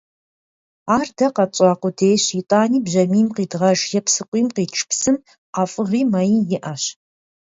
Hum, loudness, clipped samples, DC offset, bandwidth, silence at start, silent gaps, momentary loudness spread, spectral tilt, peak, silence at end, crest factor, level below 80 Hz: none; -18 LUFS; under 0.1%; under 0.1%; 8 kHz; 0.85 s; 4.28-4.32 s, 5.38-5.53 s; 7 LU; -4.5 dB/octave; -2 dBFS; 0.65 s; 16 dB; -62 dBFS